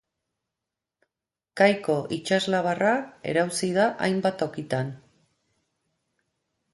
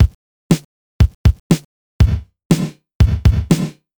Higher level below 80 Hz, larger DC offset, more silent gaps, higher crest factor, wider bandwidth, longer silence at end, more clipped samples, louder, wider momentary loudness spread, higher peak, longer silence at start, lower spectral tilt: second, -68 dBFS vs -20 dBFS; neither; second, none vs 0.15-0.50 s, 0.65-0.99 s, 1.15-1.24 s, 1.40-1.50 s, 1.65-1.99 s, 2.45-2.50 s, 2.95-3.00 s; first, 22 dB vs 14 dB; second, 11.5 kHz vs over 20 kHz; first, 1.75 s vs 0.3 s; neither; second, -25 LUFS vs -17 LUFS; first, 8 LU vs 5 LU; second, -4 dBFS vs 0 dBFS; first, 1.55 s vs 0 s; second, -5 dB/octave vs -7 dB/octave